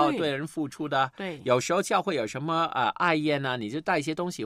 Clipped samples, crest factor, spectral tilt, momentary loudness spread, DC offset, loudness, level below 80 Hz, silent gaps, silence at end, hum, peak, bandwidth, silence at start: under 0.1%; 18 dB; -4.5 dB/octave; 7 LU; under 0.1%; -27 LUFS; -68 dBFS; none; 0 s; none; -8 dBFS; 14.5 kHz; 0 s